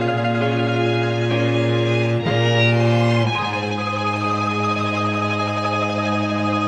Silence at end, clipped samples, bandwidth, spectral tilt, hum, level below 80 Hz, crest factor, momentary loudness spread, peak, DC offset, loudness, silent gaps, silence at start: 0 s; under 0.1%; 8.8 kHz; -6.5 dB/octave; none; -58 dBFS; 14 dB; 5 LU; -6 dBFS; under 0.1%; -19 LUFS; none; 0 s